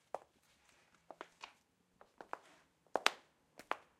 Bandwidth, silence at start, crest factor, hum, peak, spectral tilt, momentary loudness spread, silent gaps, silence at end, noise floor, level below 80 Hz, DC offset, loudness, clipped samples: 15.5 kHz; 0.15 s; 42 dB; none; -6 dBFS; -0.5 dB/octave; 25 LU; none; 0.2 s; -75 dBFS; -88 dBFS; under 0.1%; -42 LUFS; under 0.1%